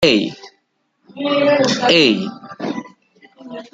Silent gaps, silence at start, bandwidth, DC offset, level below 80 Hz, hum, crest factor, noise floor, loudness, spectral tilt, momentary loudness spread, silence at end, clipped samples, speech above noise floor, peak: none; 0 s; 9.4 kHz; under 0.1%; -58 dBFS; none; 18 dB; -66 dBFS; -16 LUFS; -4 dB/octave; 17 LU; 0.1 s; under 0.1%; 50 dB; 0 dBFS